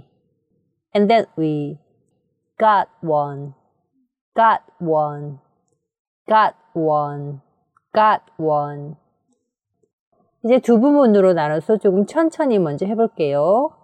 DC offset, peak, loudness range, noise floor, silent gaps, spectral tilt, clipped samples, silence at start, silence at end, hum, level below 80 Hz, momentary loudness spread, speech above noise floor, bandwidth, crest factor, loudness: under 0.1%; -4 dBFS; 6 LU; -73 dBFS; 4.21-4.32 s, 5.99-6.25 s, 9.93-10.12 s; -7.5 dB/octave; under 0.1%; 0.95 s; 0.15 s; none; -72 dBFS; 15 LU; 56 dB; 9.6 kHz; 16 dB; -18 LUFS